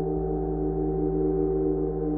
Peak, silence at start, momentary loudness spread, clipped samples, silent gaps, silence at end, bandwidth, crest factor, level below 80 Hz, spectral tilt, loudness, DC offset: -14 dBFS; 0 s; 3 LU; under 0.1%; none; 0 s; 2.1 kHz; 12 dB; -36 dBFS; -13.5 dB/octave; -27 LUFS; under 0.1%